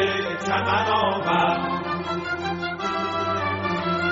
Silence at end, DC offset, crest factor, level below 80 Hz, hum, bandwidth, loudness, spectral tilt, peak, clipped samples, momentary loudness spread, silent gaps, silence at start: 0 s; under 0.1%; 16 dB; -56 dBFS; none; 7.6 kHz; -24 LUFS; -3 dB/octave; -8 dBFS; under 0.1%; 6 LU; none; 0 s